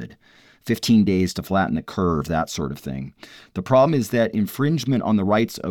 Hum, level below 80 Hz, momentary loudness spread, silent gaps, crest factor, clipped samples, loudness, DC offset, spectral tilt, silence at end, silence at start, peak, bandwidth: none; -46 dBFS; 15 LU; none; 16 dB; under 0.1%; -21 LUFS; under 0.1%; -6.5 dB/octave; 0 s; 0 s; -6 dBFS; 18.5 kHz